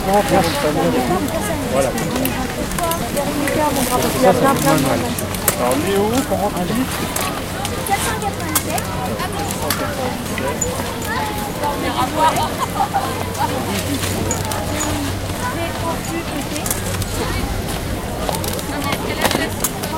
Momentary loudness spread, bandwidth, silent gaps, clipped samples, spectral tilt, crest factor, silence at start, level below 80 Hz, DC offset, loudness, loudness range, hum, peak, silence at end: 7 LU; 17 kHz; none; under 0.1%; -4 dB/octave; 20 dB; 0 s; -34 dBFS; under 0.1%; -19 LUFS; 5 LU; none; 0 dBFS; 0 s